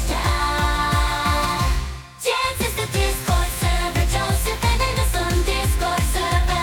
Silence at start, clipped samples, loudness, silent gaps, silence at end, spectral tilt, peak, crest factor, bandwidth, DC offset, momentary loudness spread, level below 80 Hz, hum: 0 s; under 0.1%; -21 LUFS; none; 0 s; -4 dB/octave; -6 dBFS; 14 dB; 19.5 kHz; under 0.1%; 2 LU; -24 dBFS; none